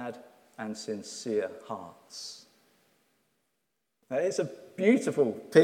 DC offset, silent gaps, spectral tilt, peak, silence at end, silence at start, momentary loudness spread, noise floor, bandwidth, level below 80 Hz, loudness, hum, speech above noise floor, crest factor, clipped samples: under 0.1%; none; -5 dB/octave; -6 dBFS; 0 s; 0 s; 18 LU; -81 dBFS; 14.5 kHz; -84 dBFS; -31 LUFS; none; 53 dB; 24 dB; under 0.1%